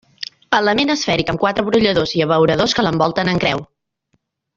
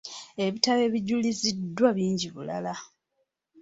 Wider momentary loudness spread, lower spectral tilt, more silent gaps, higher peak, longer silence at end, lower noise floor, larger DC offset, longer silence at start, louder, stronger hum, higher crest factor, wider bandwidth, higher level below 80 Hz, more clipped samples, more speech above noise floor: second, 5 LU vs 11 LU; about the same, -5 dB/octave vs -4.5 dB/octave; neither; first, 0 dBFS vs -6 dBFS; first, 0.9 s vs 0.75 s; second, -67 dBFS vs -77 dBFS; neither; first, 0.2 s vs 0.05 s; first, -16 LUFS vs -27 LUFS; neither; second, 16 dB vs 22 dB; about the same, 7.8 kHz vs 8 kHz; first, -46 dBFS vs -68 dBFS; neither; about the same, 51 dB vs 51 dB